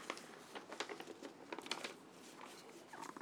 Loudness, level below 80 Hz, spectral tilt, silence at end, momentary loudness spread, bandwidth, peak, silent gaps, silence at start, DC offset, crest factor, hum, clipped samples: -50 LUFS; under -90 dBFS; -2 dB/octave; 0 s; 10 LU; over 20 kHz; -24 dBFS; none; 0 s; under 0.1%; 28 dB; none; under 0.1%